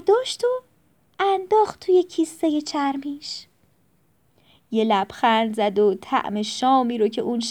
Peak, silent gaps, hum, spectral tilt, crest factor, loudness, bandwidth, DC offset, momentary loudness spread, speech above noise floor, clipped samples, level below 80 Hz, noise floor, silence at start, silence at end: -6 dBFS; none; none; -4.5 dB/octave; 16 dB; -22 LUFS; 14 kHz; under 0.1%; 9 LU; 43 dB; under 0.1%; -68 dBFS; -64 dBFS; 0.05 s; 0 s